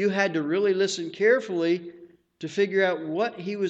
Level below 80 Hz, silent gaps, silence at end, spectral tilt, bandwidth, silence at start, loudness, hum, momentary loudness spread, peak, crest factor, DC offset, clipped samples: -76 dBFS; none; 0 s; -5 dB/octave; 8.8 kHz; 0 s; -25 LUFS; none; 8 LU; -10 dBFS; 16 dB; under 0.1%; under 0.1%